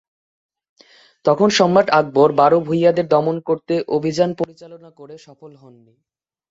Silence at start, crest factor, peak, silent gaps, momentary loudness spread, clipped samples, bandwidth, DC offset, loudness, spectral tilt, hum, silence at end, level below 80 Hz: 1.25 s; 16 dB; -2 dBFS; none; 8 LU; under 0.1%; 7.8 kHz; under 0.1%; -16 LUFS; -5.5 dB/octave; none; 1 s; -62 dBFS